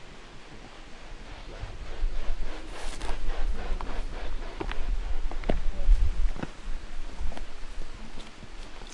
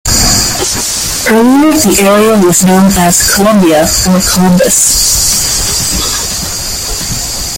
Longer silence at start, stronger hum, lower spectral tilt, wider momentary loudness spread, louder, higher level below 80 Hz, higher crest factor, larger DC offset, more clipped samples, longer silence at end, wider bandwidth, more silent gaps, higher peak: about the same, 0 s vs 0.05 s; neither; first, -5.5 dB/octave vs -3 dB/octave; first, 14 LU vs 8 LU; second, -37 LUFS vs -7 LUFS; second, -30 dBFS vs -24 dBFS; first, 18 dB vs 8 dB; neither; second, under 0.1% vs 0.1%; about the same, 0 s vs 0 s; second, 9 kHz vs over 20 kHz; neither; second, -8 dBFS vs 0 dBFS